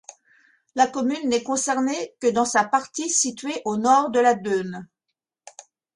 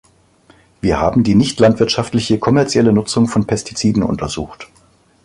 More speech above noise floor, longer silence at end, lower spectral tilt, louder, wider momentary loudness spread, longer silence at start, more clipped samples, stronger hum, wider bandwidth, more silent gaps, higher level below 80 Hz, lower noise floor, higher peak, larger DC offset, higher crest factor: first, 60 dB vs 36 dB; first, 1.1 s vs 0.6 s; second, -3 dB/octave vs -6 dB/octave; second, -22 LUFS vs -15 LUFS; about the same, 8 LU vs 9 LU; about the same, 0.75 s vs 0.85 s; neither; neither; about the same, 11.5 kHz vs 11.5 kHz; neither; second, -68 dBFS vs -38 dBFS; first, -82 dBFS vs -51 dBFS; second, -6 dBFS vs -2 dBFS; neither; about the same, 18 dB vs 14 dB